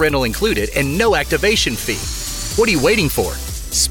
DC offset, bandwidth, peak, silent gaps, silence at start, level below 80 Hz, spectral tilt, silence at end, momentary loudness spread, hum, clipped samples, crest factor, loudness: under 0.1%; 18 kHz; -4 dBFS; none; 0 s; -28 dBFS; -3.5 dB/octave; 0 s; 8 LU; none; under 0.1%; 12 dB; -17 LUFS